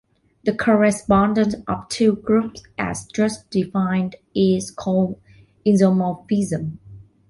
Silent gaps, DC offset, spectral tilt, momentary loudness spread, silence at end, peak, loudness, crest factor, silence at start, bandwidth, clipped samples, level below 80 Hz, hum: none; under 0.1%; -6.5 dB/octave; 10 LU; 0.3 s; -4 dBFS; -20 LUFS; 16 dB; 0.45 s; 11.5 kHz; under 0.1%; -48 dBFS; none